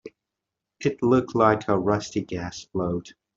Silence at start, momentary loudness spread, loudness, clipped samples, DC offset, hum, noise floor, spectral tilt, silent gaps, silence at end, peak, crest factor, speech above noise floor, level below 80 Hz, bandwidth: 0.05 s; 12 LU; -24 LUFS; under 0.1%; under 0.1%; none; -85 dBFS; -6.5 dB/octave; none; 0.25 s; -4 dBFS; 22 dB; 62 dB; -56 dBFS; 7.8 kHz